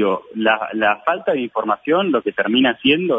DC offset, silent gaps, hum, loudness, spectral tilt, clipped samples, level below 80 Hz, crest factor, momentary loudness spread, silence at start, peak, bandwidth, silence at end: under 0.1%; none; none; -18 LUFS; -7.5 dB/octave; under 0.1%; -60 dBFS; 14 dB; 5 LU; 0 s; -4 dBFS; 3.8 kHz; 0 s